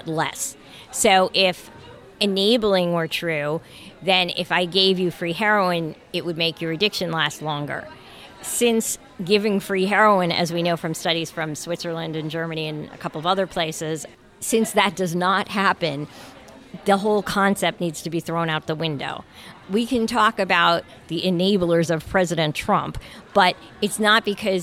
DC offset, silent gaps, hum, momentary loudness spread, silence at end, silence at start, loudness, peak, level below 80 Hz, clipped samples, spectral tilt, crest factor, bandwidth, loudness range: under 0.1%; none; none; 13 LU; 0 s; 0.05 s; -21 LUFS; -4 dBFS; -52 dBFS; under 0.1%; -4 dB/octave; 18 dB; 16.5 kHz; 4 LU